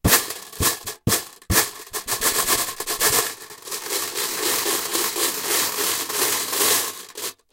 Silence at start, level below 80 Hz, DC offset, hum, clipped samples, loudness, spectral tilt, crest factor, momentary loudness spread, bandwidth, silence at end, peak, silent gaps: 0.05 s; -42 dBFS; under 0.1%; none; under 0.1%; -21 LUFS; -1.5 dB/octave; 22 dB; 12 LU; 17 kHz; 0.2 s; -2 dBFS; none